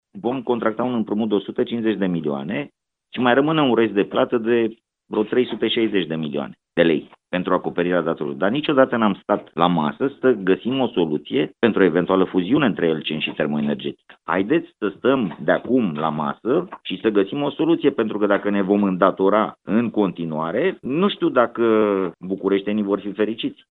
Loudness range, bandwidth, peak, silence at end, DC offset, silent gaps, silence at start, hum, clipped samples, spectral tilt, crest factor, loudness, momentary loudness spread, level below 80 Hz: 2 LU; 4.2 kHz; 0 dBFS; 0.2 s; under 0.1%; none; 0.15 s; none; under 0.1%; -9.5 dB/octave; 20 dB; -21 LUFS; 8 LU; -62 dBFS